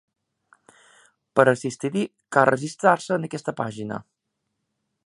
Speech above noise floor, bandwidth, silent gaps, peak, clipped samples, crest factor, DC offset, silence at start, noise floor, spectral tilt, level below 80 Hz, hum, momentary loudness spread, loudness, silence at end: 56 dB; 11 kHz; none; 0 dBFS; under 0.1%; 24 dB; under 0.1%; 1.35 s; -79 dBFS; -5.5 dB/octave; -68 dBFS; none; 11 LU; -23 LUFS; 1.05 s